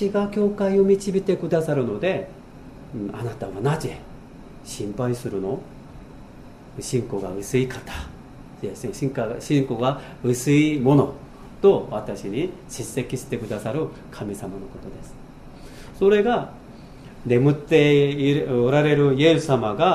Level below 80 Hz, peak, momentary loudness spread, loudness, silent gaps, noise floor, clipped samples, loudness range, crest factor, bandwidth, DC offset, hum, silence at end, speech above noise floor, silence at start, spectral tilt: -46 dBFS; -4 dBFS; 24 LU; -22 LUFS; none; -43 dBFS; under 0.1%; 10 LU; 18 dB; 15 kHz; under 0.1%; none; 0 s; 21 dB; 0 s; -6.5 dB/octave